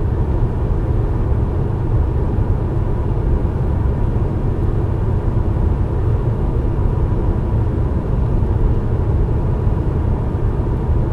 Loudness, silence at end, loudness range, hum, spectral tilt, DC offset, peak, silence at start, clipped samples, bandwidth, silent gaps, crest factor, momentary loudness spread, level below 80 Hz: -19 LUFS; 0 s; 1 LU; none; -10.5 dB/octave; under 0.1%; -4 dBFS; 0 s; under 0.1%; 4.4 kHz; none; 12 dB; 1 LU; -20 dBFS